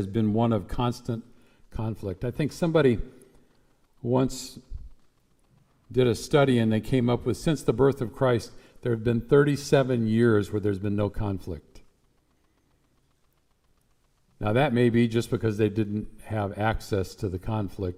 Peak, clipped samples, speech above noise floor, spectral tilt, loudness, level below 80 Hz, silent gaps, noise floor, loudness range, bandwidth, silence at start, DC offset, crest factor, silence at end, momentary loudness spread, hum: -8 dBFS; under 0.1%; 42 dB; -7 dB/octave; -26 LUFS; -46 dBFS; none; -67 dBFS; 8 LU; 15.5 kHz; 0 s; under 0.1%; 20 dB; 0 s; 13 LU; none